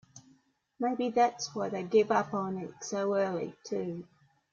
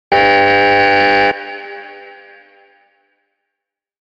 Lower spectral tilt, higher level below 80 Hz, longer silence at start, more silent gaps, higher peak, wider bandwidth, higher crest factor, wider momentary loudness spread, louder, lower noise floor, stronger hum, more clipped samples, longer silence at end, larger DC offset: about the same, -5 dB/octave vs -5 dB/octave; second, -76 dBFS vs -50 dBFS; about the same, 0.15 s vs 0.1 s; neither; second, -14 dBFS vs 0 dBFS; about the same, 7.6 kHz vs 7.8 kHz; about the same, 18 dB vs 16 dB; second, 10 LU vs 21 LU; second, -31 LUFS vs -11 LUFS; second, -67 dBFS vs -81 dBFS; neither; neither; second, 0.5 s vs 1.9 s; neither